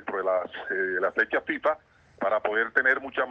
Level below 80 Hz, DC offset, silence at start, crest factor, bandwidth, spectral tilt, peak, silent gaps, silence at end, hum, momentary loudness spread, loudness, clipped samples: -68 dBFS; under 0.1%; 0 s; 20 dB; 6.8 kHz; -5.5 dB/octave; -8 dBFS; none; 0 s; none; 7 LU; -26 LUFS; under 0.1%